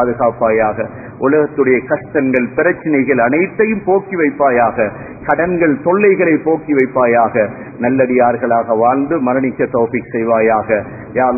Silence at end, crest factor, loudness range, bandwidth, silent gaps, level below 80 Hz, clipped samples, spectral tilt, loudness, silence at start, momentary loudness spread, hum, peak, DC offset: 0 s; 14 dB; 1 LU; 2.7 kHz; none; -46 dBFS; under 0.1%; -12.5 dB/octave; -14 LUFS; 0 s; 6 LU; none; 0 dBFS; under 0.1%